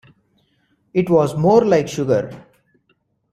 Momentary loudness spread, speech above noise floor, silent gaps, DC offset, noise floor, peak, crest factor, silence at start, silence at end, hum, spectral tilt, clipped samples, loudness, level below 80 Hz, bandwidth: 9 LU; 49 dB; none; under 0.1%; -65 dBFS; -2 dBFS; 18 dB; 0.95 s; 0.95 s; none; -7 dB/octave; under 0.1%; -17 LUFS; -54 dBFS; 13 kHz